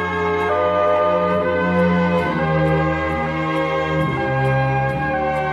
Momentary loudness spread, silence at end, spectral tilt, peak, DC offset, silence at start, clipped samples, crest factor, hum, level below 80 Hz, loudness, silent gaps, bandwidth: 4 LU; 0 s; -8 dB/octave; -6 dBFS; under 0.1%; 0 s; under 0.1%; 12 dB; none; -38 dBFS; -19 LUFS; none; 10.5 kHz